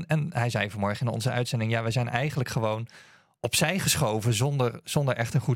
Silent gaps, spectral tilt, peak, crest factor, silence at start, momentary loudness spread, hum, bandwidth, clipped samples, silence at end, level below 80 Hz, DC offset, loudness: none; -4.5 dB/octave; -8 dBFS; 20 dB; 0 s; 5 LU; none; 16.5 kHz; under 0.1%; 0 s; -58 dBFS; under 0.1%; -27 LUFS